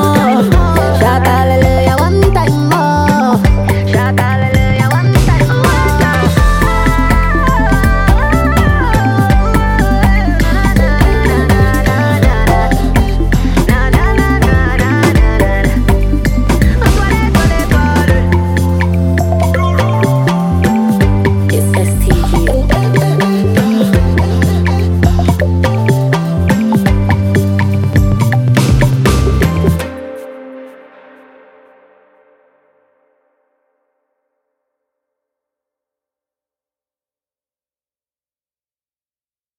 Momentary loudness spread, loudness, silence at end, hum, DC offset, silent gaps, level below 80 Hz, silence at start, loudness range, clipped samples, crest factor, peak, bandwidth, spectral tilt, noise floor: 2 LU; -11 LUFS; 8.85 s; none; under 0.1%; none; -16 dBFS; 0 s; 1 LU; under 0.1%; 10 dB; 0 dBFS; 17 kHz; -6.5 dB/octave; under -90 dBFS